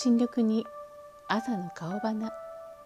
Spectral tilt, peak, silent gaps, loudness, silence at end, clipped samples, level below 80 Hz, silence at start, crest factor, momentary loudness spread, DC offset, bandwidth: -6 dB/octave; -12 dBFS; none; -30 LUFS; 0 s; under 0.1%; -70 dBFS; 0 s; 18 dB; 19 LU; under 0.1%; 9.2 kHz